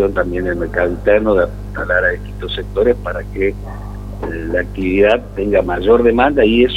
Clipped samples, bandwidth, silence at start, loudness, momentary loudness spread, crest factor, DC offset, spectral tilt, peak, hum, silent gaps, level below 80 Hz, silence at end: under 0.1%; 13 kHz; 0 s; -16 LUFS; 13 LU; 14 dB; under 0.1%; -7.5 dB/octave; 0 dBFS; 50 Hz at -25 dBFS; none; -28 dBFS; 0 s